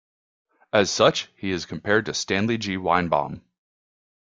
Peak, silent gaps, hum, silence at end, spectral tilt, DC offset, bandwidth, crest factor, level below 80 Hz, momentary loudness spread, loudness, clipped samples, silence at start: -2 dBFS; none; none; 0.9 s; -4 dB/octave; under 0.1%; 9.4 kHz; 22 dB; -58 dBFS; 9 LU; -23 LUFS; under 0.1%; 0.75 s